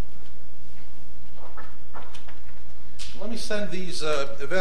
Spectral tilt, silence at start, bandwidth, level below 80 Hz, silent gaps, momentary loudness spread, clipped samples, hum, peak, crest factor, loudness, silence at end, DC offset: -4.5 dB/octave; 0 s; 15 kHz; -48 dBFS; none; 21 LU; under 0.1%; none; -6 dBFS; 24 dB; -32 LUFS; 0 s; 20%